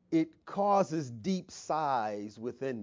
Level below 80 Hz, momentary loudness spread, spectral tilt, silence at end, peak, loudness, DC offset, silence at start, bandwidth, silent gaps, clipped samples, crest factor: -72 dBFS; 10 LU; -6.5 dB/octave; 0 s; -14 dBFS; -33 LUFS; under 0.1%; 0.1 s; 7.6 kHz; none; under 0.1%; 18 dB